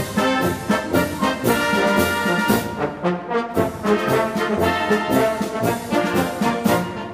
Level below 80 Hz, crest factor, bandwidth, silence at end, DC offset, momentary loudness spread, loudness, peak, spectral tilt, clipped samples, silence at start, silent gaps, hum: -46 dBFS; 16 dB; 15.5 kHz; 0 s; under 0.1%; 5 LU; -20 LUFS; -4 dBFS; -5 dB/octave; under 0.1%; 0 s; none; none